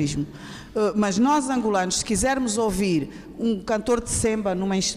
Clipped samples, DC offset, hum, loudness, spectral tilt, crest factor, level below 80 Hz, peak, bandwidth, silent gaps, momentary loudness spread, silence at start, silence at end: under 0.1%; under 0.1%; none; -23 LUFS; -4 dB/octave; 10 dB; -44 dBFS; -12 dBFS; 15 kHz; none; 9 LU; 0 s; 0 s